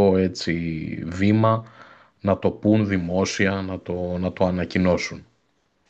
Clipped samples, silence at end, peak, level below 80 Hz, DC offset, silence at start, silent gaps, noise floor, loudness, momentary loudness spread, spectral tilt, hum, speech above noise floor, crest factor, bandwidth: under 0.1%; 0.65 s; -6 dBFS; -56 dBFS; under 0.1%; 0 s; none; -68 dBFS; -23 LUFS; 10 LU; -6.5 dB/octave; none; 46 dB; 16 dB; 8.2 kHz